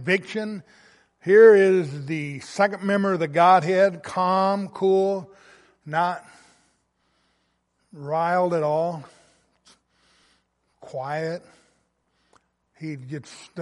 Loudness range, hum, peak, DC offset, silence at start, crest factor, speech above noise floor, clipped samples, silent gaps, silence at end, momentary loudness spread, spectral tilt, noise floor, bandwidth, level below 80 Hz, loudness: 17 LU; none; -4 dBFS; under 0.1%; 0 s; 20 dB; 49 dB; under 0.1%; none; 0 s; 20 LU; -6.5 dB/octave; -71 dBFS; 11.5 kHz; -72 dBFS; -21 LUFS